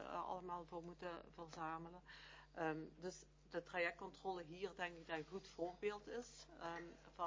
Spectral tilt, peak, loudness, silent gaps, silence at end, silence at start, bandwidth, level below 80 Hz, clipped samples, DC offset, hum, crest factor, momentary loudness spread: -4.5 dB/octave; -28 dBFS; -50 LUFS; none; 0 s; 0 s; 7.6 kHz; -72 dBFS; under 0.1%; under 0.1%; none; 22 dB; 13 LU